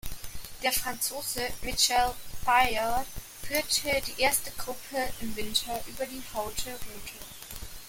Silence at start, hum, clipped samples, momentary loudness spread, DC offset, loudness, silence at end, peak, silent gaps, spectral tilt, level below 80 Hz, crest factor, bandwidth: 0.05 s; none; under 0.1%; 17 LU; under 0.1%; -29 LUFS; 0 s; -8 dBFS; none; -1.5 dB/octave; -46 dBFS; 22 dB; 17 kHz